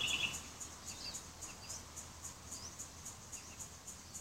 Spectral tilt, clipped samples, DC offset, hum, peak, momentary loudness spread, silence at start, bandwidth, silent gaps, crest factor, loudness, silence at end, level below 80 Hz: -0.5 dB/octave; under 0.1%; under 0.1%; none; -24 dBFS; 10 LU; 0 s; 16 kHz; none; 22 dB; -45 LUFS; 0 s; -62 dBFS